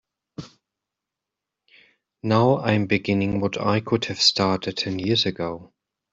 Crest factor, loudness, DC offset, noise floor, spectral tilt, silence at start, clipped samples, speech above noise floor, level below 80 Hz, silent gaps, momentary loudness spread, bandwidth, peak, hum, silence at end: 20 dB; -22 LUFS; under 0.1%; -86 dBFS; -5 dB/octave; 0.4 s; under 0.1%; 64 dB; -58 dBFS; none; 20 LU; 8 kHz; -4 dBFS; none; 0.45 s